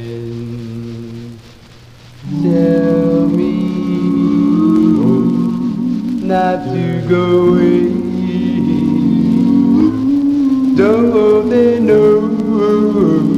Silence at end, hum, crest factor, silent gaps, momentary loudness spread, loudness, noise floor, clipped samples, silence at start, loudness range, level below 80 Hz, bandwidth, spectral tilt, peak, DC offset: 0 s; none; 12 dB; none; 14 LU; -13 LUFS; -39 dBFS; under 0.1%; 0 s; 4 LU; -44 dBFS; 8.4 kHz; -9 dB/octave; 0 dBFS; 0.2%